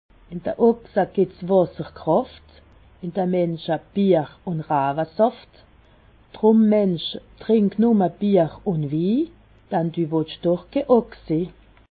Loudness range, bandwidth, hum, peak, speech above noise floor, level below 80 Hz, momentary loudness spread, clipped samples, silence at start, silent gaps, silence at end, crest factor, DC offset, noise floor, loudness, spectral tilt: 3 LU; 4.8 kHz; none; -4 dBFS; 32 dB; -54 dBFS; 12 LU; under 0.1%; 0.3 s; none; 0.4 s; 18 dB; under 0.1%; -53 dBFS; -21 LUFS; -12 dB/octave